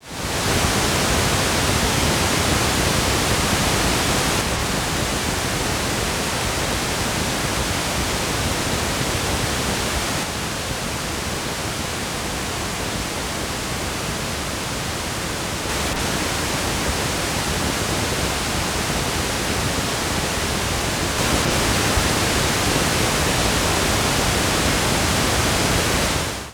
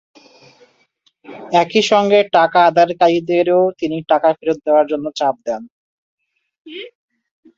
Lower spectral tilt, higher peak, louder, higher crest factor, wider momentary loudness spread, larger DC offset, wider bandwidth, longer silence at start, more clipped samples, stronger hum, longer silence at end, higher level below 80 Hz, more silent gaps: second, -3 dB/octave vs -5 dB/octave; second, -4 dBFS vs 0 dBFS; second, -20 LUFS vs -15 LUFS; about the same, 16 dB vs 16 dB; second, 6 LU vs 20 LU; neither; first, over 20 kHz vs 7.8 kHz; second, 0.05 s vs 1.3 s; neither; neither; second, 0 s vs 0.7 s; first, -32 dBFS vs -64 dBFS; second, none vs 5.70-6.17 s, 6.58-6.65 s